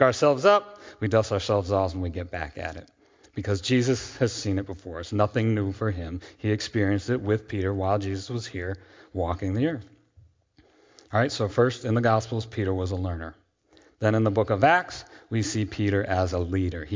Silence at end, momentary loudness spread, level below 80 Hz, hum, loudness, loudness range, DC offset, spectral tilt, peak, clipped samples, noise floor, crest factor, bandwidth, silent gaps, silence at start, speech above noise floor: 0 s; 14 LU; -44 dBFS; none; -26 LUFS; 4 LU; under 0.1%; -6 dB/octave; -4 dBFS; under 0.1%; -61 dBFS; 20 dB; 7.6 kHz; none; 0 s; 36 dB